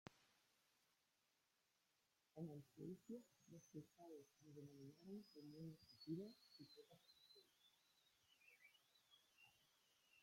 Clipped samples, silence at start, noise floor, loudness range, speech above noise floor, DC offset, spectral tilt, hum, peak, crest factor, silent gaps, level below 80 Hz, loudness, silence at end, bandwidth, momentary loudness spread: under 0.1%; 0.05 s; -87 dBFS; 3 LU; 27 dB; under 0.1%; -6.5 dB/octave; none; -38 dBFS; 24 dB; none; under -90 dBFS; -61 LUFS; 0 s; 16.5 kHz; 13 LU